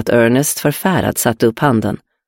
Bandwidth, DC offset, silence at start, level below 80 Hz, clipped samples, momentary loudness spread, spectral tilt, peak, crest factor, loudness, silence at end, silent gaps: 17 kHz; under 0.1%; 0 s; -46 dBFS; under 0.1%; 4 LU; -5 dB/octave; 0 dBFS; 14 dB; -15 LUFS; 0.3 s; none